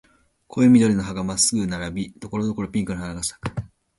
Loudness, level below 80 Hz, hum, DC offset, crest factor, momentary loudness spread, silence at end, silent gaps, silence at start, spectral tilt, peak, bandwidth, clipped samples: -22 LUFS; -46 dBFS; none; under 0.1%; 18 dB; 16 LU; 0.3 s; none; 0.55 s; -4.5 dB/octave; -4 dBFS; 11.5 kHz; under 0.1%